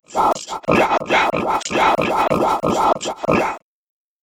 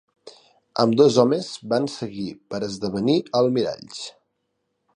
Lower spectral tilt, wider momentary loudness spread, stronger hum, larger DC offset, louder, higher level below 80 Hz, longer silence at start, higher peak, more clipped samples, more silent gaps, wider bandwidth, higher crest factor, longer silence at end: second, -4.5 dB/octave vs -6 dB/octave; second, 5 LU vs 17 LU; neither; first, 0.1% vs under 0.1%; first, -18 LUFS vs -22 LUFS; first, -46 dBFS vs -62 dBFS; second, 0.1 s vs 0.25 s; about the same, -2 dBFS vs -2 dBFS; neither; neither; first, over 20 kHz vs 10.5 kHz; about the same, 16 dB vs 20 dB; second, 0.65 s vs 0.85 s